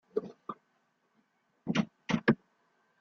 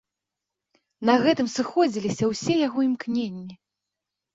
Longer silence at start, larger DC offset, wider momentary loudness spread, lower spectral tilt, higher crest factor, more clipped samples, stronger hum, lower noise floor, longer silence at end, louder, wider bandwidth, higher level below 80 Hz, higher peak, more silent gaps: second, 0.15 s vs 1 s; neither; first, 17 LU vs 10 LU; first, -6.5 dB/octave vs -5 dB/octave; first, 24 dB vs 18 dB; neither; neither; second, -75 dBFS vs -86 dBFS; second, 0.65 s vs 0.8 s; second, -33 LUFS vs -24 LUFS; second, 7 kHz vs 7.8 kHz; about the same, -68 dBFS vs -66 dBFS; second, -12 dBFS vs -6 dBFS; neither